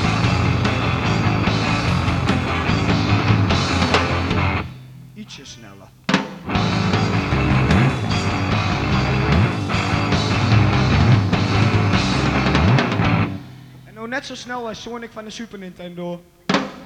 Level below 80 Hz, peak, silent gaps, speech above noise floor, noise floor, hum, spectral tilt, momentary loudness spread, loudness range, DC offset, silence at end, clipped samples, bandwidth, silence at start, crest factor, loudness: -32 dBFS; -2 dBFS; none; 12 dB; -42 dBFS; none; -6 dB/octave; 16 LU; 5 LU; under 0.1%; 0 s; under 0.1%; 10 kHz; 0 s; 18 dB; -19 LUFS